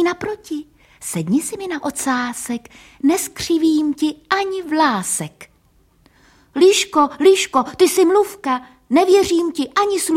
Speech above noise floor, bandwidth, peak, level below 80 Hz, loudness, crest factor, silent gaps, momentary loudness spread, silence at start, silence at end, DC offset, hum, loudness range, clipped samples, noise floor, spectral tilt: 39 dB; 16.5 kHz; -2 dBFS; -54 dBFS; -17 LUFS; 16 dB; none; 13 LU; 0 s; 0 s; under 0.1%; none; 6 LU; under 0.1%; -56 dBFS; -3.5 dB/octave